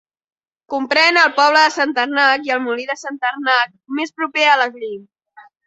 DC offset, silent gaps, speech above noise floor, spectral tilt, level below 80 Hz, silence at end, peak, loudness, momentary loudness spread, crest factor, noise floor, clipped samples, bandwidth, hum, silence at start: under 0.1%; none; 30 dB; -1 dB/octave; -70 dBFS; 0.25 s; 0 dBFS; -16 LUFS; 13 LU; 16 dB; -47 dBFS; under 0.1%; 8.2 kHz; none; 0.7 s